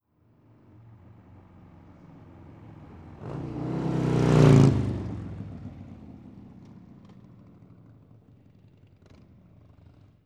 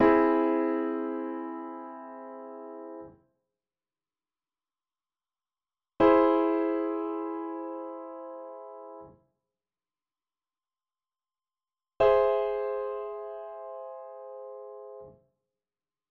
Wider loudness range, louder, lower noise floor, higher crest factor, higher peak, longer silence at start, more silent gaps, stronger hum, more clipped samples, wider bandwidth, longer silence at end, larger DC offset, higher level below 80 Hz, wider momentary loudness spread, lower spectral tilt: about the same, 21 LU vs 19 LU; first, -23 LUFS vs -27 LUFS; second, -62 dBFS vs under -90 dBFS; about the same, 24 dB vs 22 dB; first, -4 dBFS vs -10 dBFS; first, 2.65 s vs 0 s; neither; neither; neither; first, 9.8 kHz vs 5.4 kHz; first, 3.75 s vs 1 s; neither; first, -48 dBFS vs -64 dBFS; first, 31 LU vs 22 LU; first, -8 dB/octave vs -4.5 dB/octave